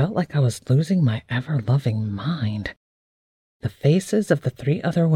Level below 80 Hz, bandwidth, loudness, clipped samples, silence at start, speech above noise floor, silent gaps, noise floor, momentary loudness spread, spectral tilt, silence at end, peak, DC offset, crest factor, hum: -54 dBFS; 13 kHz; -22 LUFS; under 0.1%; 0 s; over 69 dB; 2.77-3.60 s; under -90 dBFS; 7 LU; -7.5 dB/octave; 0 s; -4 dBFS; under 0.1%; 18 dB; none